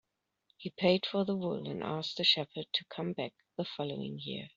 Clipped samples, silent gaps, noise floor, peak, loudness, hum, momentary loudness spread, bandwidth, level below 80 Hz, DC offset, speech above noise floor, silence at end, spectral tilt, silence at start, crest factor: under 0.1%; none; -76 dBFS; -12 dBFS; -33 LUFS; none; 13 LU; 7.6 kHz; -74 dBFS; under 0.1%; 42 dB; 0.1 s; -3.5 dB/octave; 0.6 s; 22 dB